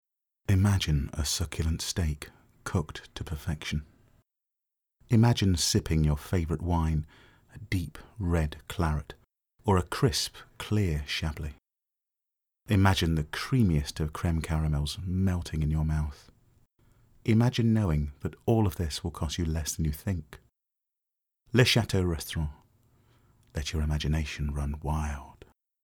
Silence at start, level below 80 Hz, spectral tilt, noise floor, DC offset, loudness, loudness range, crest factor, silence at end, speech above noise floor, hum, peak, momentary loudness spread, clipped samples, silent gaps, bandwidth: 0.5 s; -38 dBFS; -5.5 dB/octave; -89 dBFS; under 0.1%; -29 LUFS; 5 LU; 20 dB; 0.55 s; 61 dB; none; -8 dBFS; 12 LU; under 0.1%; none; 18.5 kHz